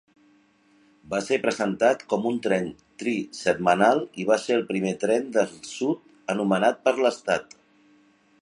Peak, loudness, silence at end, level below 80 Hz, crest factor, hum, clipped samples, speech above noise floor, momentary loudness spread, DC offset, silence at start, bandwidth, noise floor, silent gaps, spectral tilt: -4 dBFS; -25 LUFS; 1 s; -66 dBFS; 20 dB; none; under 0.1%; 37 dB; 8 LU; under 0.1%; 1.1 s; 11 kHz; -60 dBFS; none; -5 dB/octave